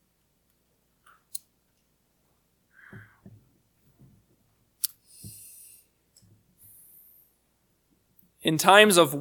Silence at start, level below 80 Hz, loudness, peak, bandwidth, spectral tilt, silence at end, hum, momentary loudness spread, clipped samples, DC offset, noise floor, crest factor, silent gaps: 1.35 s; -72 dBFS; -20 LUFS; 0 dBFS; 19 kHz; -3 dB/octave; 0 s; none; 30 LU; under 0.1%; under 0.1%; -71 dBFS; 30 dB; none